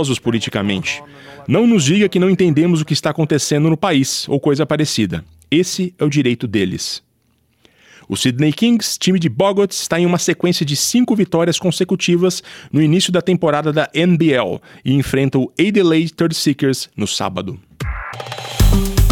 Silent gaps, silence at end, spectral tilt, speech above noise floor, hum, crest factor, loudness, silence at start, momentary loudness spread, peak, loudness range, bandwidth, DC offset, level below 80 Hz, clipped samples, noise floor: none; 0 s; -5 dB/octave; 45 dB; none; 14 dB; -16 LUFS; 0 s; 10 LU; -2 dBFS; 3 LU; 18 kHz; under 0.1%; -30 dBFS; under 0.1%; -60 dBFS